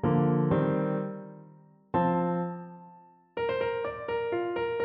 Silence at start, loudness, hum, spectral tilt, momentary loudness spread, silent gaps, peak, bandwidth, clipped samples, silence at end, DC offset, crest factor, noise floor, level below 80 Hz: 0 s; -29 LUFS; none; -11 dB/octave; 17 LU; none; -14 dBFS; 5.2 kHz; under 0.1%; 0 s; under 0.1%; 16 dB; -55 dBFS; -58 dBFS